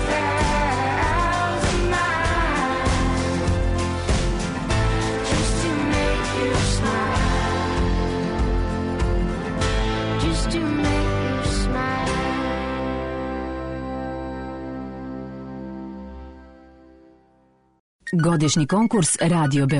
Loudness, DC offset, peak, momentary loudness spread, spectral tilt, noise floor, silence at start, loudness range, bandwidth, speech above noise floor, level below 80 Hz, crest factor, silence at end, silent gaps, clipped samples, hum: -22 LUFS; under 0.1%; -8 dBFS; 13 LU; -5 dB/octave; -59 dBFS; 0 s; 11 LU; 11 kHz; 41 dB; -28 dBFS; 14 dB; 0 s; 17.80-17.99 s; under 0.1%; none